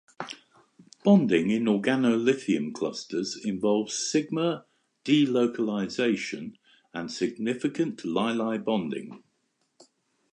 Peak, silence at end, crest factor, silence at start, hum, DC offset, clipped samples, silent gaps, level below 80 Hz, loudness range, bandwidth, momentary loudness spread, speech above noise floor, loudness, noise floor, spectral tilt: -8 dBFS; 1.15 s; 20 dB; 0.2 s; none; under 0.1%; under 0.1%; none; -70 dBFS; 5 LU; 10 kHz; 16 LU; 48 dB; -26 LUFS; -74 dBFS; -5 dB/octave